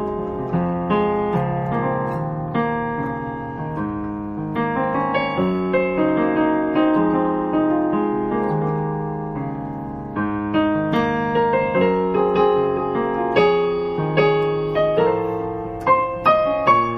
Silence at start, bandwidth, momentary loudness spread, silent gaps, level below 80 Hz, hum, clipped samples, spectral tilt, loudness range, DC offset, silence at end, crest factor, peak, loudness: 0 s; 6.2 kHz; 9 LU; none; -46 dBFS; none; under 0.1%; -9 dB/octave; 5 LU; under 0.1%; 0 s; 18 dB; -2 dBFS; -20 LUFS